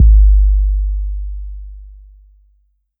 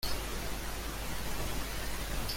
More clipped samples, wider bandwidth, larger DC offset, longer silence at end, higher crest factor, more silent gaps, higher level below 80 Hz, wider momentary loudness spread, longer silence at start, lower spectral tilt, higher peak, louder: neither; second, 0.2 kHz vs 17 kHz; neither; first, 1.1 s vs 0 s; about the same, 12 dB vs 14 dB; neither; first, -14 dBFS vs -40 dBFS; first, 22 LU vs 2 LU; about the same, 0 s vs 0 s; first, -16 dB/octave vs -3 dB/octave; first, -2 dBFS vs -22 dBFS; first, -16 LUFS vs -38 LUFS